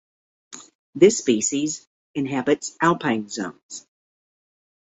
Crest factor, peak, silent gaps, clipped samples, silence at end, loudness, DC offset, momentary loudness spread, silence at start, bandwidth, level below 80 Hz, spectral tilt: 22 dB; -2 dBFS; 0.75-0.93 s, 1.87-2.14 s, 3.63-3.69 s; under 0.1%; 1.1 s; -22 LUFS; under 0.1%; 24 LU; 0.5 s; 8.4 kHz; -66 dBFS; -4 dB/octave